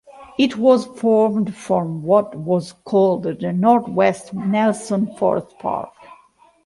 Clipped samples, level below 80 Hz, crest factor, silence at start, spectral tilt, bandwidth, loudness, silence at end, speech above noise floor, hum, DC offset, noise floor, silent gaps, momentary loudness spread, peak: under 0.1%; -60 dBFS; 16 dB; 0.15 s; -6.5 dB/octave; 11.5 kHz; -19 LUFS; 0.75 s; 35 dB; none; under 0.1%; -53 dBFS; none; 9 LU; -2 dBFS